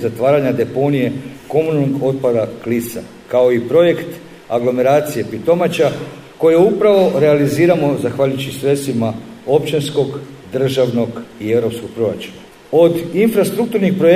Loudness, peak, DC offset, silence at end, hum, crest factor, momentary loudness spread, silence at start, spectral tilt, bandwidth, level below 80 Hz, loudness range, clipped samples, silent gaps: -15 LUFS; 0 dBFS; under 0.1%; 0 s; none; 14 dB; 11 LU; 0 s; -6.5 dB/octave; 15.5 kHz; -54 dBFS; 4 LU; under 0.1%; none